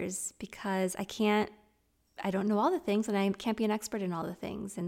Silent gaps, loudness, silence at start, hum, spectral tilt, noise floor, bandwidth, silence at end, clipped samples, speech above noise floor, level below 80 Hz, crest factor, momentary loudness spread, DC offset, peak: none; -32 LUFS; 0 s; none; -5 dB/octave; -72 dBFS; 16.5 kHz; 0 s; under 0.1%; 40 dB; -66 dBFS; 16 dB; 10 LU; under 0.1%; -16 dBFS